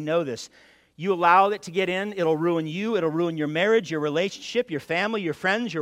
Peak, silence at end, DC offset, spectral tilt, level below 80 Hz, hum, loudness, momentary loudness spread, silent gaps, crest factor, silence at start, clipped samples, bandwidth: -4 dBFS; 0 s; under 0.1%; -5.5 dB/octave; -70 dBFS; none; -24 LUFS; 9 LU; none; 20 dB; 0 s; under 0.1%; 15.5 kHz